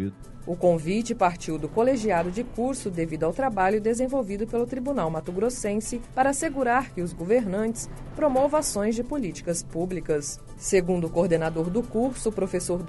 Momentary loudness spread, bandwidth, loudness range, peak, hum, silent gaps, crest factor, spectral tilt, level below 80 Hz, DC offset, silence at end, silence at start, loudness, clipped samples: 7 LU; 11.5 kHz; 1 LU; -8 dBFS; none; none; 16 dB; -5.5 dB/octave; -44 dBFS; under 0.1%; 0 s; 0 s; -26 LUFS; under 0.1%